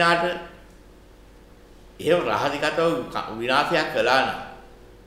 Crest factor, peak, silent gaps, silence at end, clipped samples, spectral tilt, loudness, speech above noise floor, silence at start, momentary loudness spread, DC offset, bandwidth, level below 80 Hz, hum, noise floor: 20 dB; -4 dBFS; none; 0.15 s; under 0.1%; -4.5 dB/octave; -23 LUFS; 26 dB; 0 s; 14 LU; under 0.1%; 15.5 kHz; -52 dBFS; none; -48 dBFS